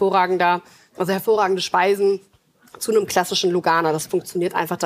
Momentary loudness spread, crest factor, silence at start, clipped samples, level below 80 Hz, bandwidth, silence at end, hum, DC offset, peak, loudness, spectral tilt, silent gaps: 6 LU; 16 dB; 0 s; under 0.1%; -66 dBFS; 15.5 kHz; 0 s; none; under 0.1%; -4 dBFS; -20 LUFS; -4 dB/octave; none